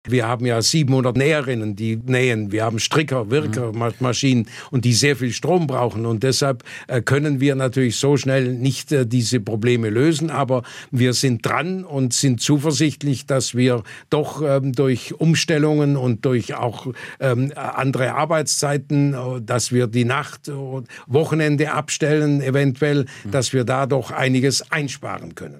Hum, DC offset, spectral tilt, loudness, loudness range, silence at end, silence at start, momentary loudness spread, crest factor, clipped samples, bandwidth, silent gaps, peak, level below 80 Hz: none; under 0.1%; -5 dB/octave; -19 LUFS; 2 LU; 0 s; 0.05 s; 7 LU; 14 dB; under 0.1%; 14.5 kHz; none; -4 dBFS; -60 dBFS